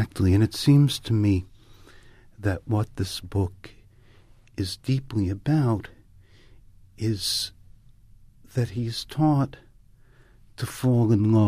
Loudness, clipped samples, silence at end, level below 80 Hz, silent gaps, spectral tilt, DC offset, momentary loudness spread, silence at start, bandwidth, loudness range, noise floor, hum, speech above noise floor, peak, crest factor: -25 LUFS; under 0.1%; 0 s; -50 dBFS; none; -6.5 dB/octave; under 0.1%; 12 LU; 0 s; 15 kHz; 6 LU; -53 dBFS; none; 31 dB; -8 dBFS; 18 dB